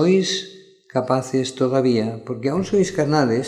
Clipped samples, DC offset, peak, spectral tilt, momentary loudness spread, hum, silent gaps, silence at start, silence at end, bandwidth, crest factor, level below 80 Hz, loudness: under 0.1%; under 0.1%; -4 dBFS; -5.5 dB/octave; 8 LU; none; none; 0 s; 0 s; 11.5 kHz; 16 dB; -56 dBFS; -21 LUFS